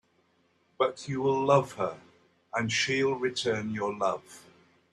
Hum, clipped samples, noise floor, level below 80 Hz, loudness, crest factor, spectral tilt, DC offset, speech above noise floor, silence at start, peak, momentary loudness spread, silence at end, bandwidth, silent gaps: none; under 0.1%; -69 dBFS; -70 dBFS; -29 LUFS; 20 dB; -4.5 dB/octave; under 0.1%; 41 dB; 0.8 s; -10 dBFS; 10 LU; 0.5 s; 12 kHz; none